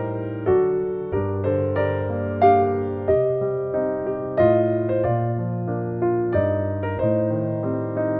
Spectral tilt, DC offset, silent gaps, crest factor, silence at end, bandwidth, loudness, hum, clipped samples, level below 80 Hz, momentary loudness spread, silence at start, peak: -12 dB/octave; under 0.1%; none; 18 dB; 0 s; 4.6 kHz; -22 LUFS; none; under 0.1%; -50 dBFS; 8 LU; 0 s; -4 dBFS